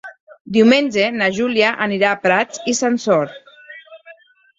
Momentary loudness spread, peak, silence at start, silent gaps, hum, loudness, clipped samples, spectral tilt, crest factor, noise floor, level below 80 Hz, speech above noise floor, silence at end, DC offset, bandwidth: 8 LU; -2 dBFS; 0.05 s; 0.20-0.27 s, 0.41-0.45 s; none; -16 LUFS; under 0.1%; -4 dB/octave; 16 dB; -46 dBFS; -60 dBFS; 30 dB; 0.45 s; under 0.1%; 8 kHz